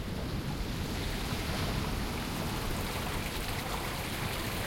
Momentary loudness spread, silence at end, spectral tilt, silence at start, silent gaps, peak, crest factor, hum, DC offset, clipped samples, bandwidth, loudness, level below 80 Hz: 3 LU; 0 s; -4.5 dB/octave; 0 s; none; -20 dBFS; 14 dB; none; under 0.1%; under 0.1%; 16.5 kHz; -35 LUFS; -40 dBFS